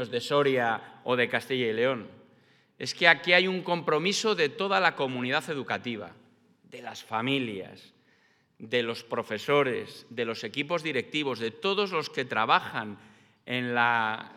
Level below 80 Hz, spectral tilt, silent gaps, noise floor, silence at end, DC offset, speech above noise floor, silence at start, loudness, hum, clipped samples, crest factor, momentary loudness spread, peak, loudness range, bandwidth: -86 dBFS; -4 dB/octave; none; -66 dBFS; 0 s; under 0.1%; 38 dB; 0 s; -27 LUFS; none; under 0.1%; 26 dB; 13 LU; -4 dBFS; 8 LU; 15 kHz